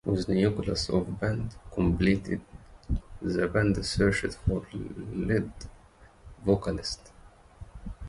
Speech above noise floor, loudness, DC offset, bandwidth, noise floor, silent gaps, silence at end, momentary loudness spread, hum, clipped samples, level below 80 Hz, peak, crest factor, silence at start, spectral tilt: 27 dB; -29 LUFS; under 0.1%; 11.5 kHz; -55 dBFS; none; 0 s; 14 LU; none; under 0.1%; -40 dBFS; -10 dBFS; 20 dB; 0.05 s; -6 dB/octave